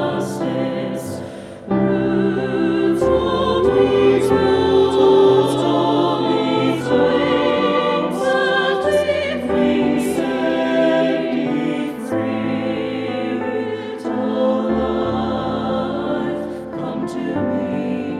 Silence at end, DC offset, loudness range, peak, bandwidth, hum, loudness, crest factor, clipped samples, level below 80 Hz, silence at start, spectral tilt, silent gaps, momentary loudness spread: 0 s; under 0.1%; 6 LU; -2 dBFS; 13.5 kHz; none; -18 LUFS; 16 dB; under 0.1%; -44 dBFS; 0 s; -6.5 dB/octave; none; 9 LU